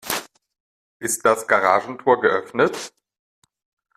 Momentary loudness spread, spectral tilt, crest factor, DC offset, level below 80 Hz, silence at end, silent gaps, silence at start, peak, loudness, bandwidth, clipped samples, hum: 12 LU; -3 dB/octave; 20 dB; under 0.1%; -64 dBFS; 1.1 s; 0.60-1.00 s; 0.05 s; -2 dBFS; -20 LUFS; 15.5 kHz; under 0.1%; none